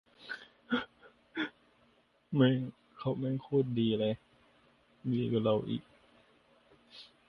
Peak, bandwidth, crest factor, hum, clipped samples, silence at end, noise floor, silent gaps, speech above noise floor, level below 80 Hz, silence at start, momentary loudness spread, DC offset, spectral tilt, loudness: -14 dBFS; 6 kHz; 22 dB; none; under 0.1%; 0.25 s; -69 dBFS; none; 38 dB; -70 dBFS; 0.2 s; 16 LU; under 0.1%; -9 dB/octave; -34 LUFS